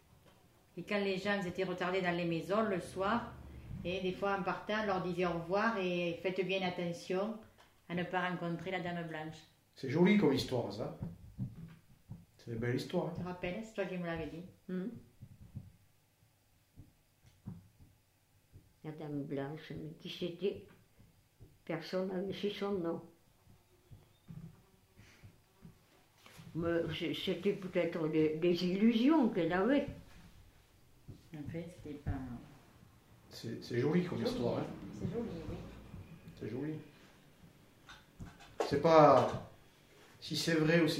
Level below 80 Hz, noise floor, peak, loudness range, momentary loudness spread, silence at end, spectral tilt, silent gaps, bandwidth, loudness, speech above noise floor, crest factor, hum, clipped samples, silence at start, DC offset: -62 dBFS; -71 dBFS; -12 dBFS; 15 LU; 22 LU; 0 s; -6.5 dB/octave; none; 16 kHz; -35 LUFS; 36 dB; 26 dB; none; under 0.1%; 0.75 s; under 0.1%